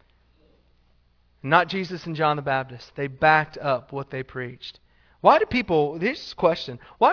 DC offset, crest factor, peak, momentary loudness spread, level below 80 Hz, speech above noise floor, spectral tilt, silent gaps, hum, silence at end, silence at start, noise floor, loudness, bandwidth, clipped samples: under 0.1%; 22 dB; -2 dBFS; 16 LU; -56 dBFS; 39 dB; -6.5 dB/octave; none; 60 Hz at -60 dBFS; 0 s; 1.45 s; -62 dBFS; -23 LUFS; 5.4 kHz; under 0.1%